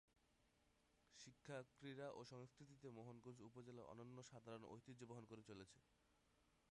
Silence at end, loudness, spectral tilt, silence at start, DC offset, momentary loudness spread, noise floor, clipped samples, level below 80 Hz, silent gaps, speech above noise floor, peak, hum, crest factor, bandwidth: 0 s; -61 LUFS; -5.5 dB/octave; 0.1 s; under 0.1%; 7 LU; -82 dBFS; under 0.1%; -86 dBFS; none; 22 dB; -42 dBFS; none; 20 dB; 11 kHz